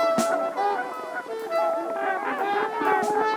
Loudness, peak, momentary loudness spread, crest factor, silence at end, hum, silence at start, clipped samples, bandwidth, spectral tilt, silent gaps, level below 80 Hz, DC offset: -26 LUFS; -10 dBFS; 9 LU; 16 dB; 0 s; none; 0 s; under 0.1%; over 20 kHz; -3.5 dB/octave; none; -74 dBFS; under 0.1%